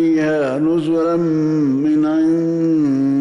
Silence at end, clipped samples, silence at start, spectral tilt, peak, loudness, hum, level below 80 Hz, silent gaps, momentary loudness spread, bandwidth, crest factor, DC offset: 0 s; under 0.1%; 0 s; -8.5 dB/octave; -10 dBFS; -16 LUFS; none; -58 dBFS; none; 2 LU; 7.4 kHz; 6 dB; under 0.1%